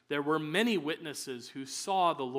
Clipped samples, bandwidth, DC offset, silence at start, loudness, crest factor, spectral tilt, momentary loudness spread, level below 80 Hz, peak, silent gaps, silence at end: under 0.1%; 16 kHz; under 0.1%; 0.1 s; -32 LUFS; 20 dB; -4 dB/octave; 11 LU; -82 dBFS; -12 dBFS; none; 0 s